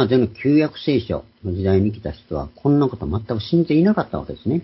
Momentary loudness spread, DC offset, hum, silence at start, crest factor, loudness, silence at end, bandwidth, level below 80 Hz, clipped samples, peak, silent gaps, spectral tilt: 11 LU; under 0.1%; none; 0 s; 16 dB; -20 LUFS; 0 s; 5.8 kHz; -38 dBFS; under 0.1%; -2 dBFS; none; -12 dB/octave